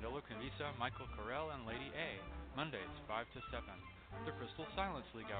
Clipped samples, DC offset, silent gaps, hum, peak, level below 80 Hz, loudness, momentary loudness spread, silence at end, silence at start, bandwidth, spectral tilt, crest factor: under 0.1%; under 0.1%; none; none; -24 dBFS; -58 dBFS; -46 LUFS; 6 LU; 0 s; 0 s; 4.6 kHz; -3.5 dB/octave; 22 dB